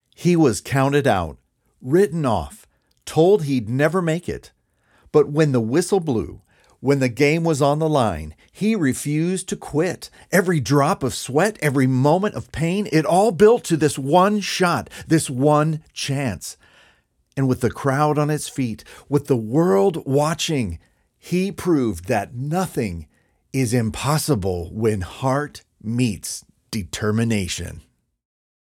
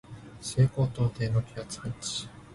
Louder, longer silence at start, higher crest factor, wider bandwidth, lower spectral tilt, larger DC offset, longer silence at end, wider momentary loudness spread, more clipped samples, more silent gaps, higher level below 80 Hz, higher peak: first, -20 LUFS vs -30 LUFS; about the same, 0.2 s vs 0.1 s; about the same, 18 dB vs 18 dB; first, 16.5 kHz vs 11.5 kHz; about the same, -6 dB/octave vs -5.5 dB/octave; neither; first, 0.9 s vs 0 s; about the same, 12 LU vs 13 LU; neither; neither; about the same, -48 dBFS vs -52 dBFS; first, -2 dBFS vs -12 dBFS